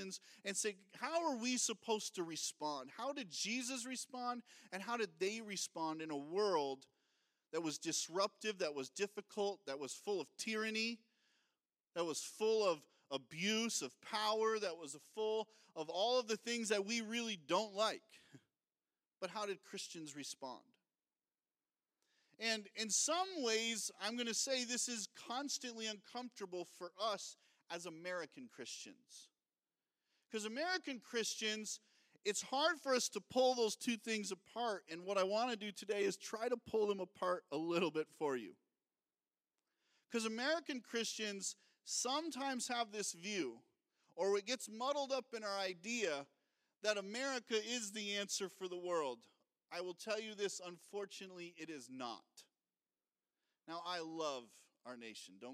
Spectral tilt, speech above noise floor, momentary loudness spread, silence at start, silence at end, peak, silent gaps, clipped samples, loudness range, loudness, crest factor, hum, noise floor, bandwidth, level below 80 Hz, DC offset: -2 dB/octave; over 48 dB; 13 LU; 0 s; 0 s; -20 dBFS; 11.80-11.84 s; under 0.1%; 9 LU; -41 LUFS; 22 dB; none; under -90 dBFS; 15.5 kHz; under -90 dBFS; under 0.1%